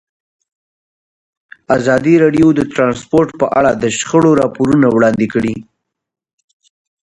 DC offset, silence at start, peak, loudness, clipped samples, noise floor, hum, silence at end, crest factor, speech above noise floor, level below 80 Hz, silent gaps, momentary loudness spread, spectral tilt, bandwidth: under 0.1%; 1.7 s; 0 dBFS; -12 LUFS; under 0.1%; under -90 dBFS; none; 1.5 s; 14 dB; over 78 dB; -46 dBFS; none; 6 LU; -6 dB/octave; 11 kHz